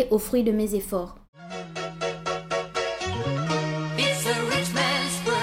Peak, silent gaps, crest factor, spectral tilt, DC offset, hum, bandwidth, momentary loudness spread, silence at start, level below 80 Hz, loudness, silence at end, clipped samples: -10 dBFS; 1.28-1.33 s; 16 dB; -4 dB/octave; under 0.1%; none; 16.5 kHz; 10 LU; 0 s; -50 dBFS; -26 LUFS; 0 s; under 0.1%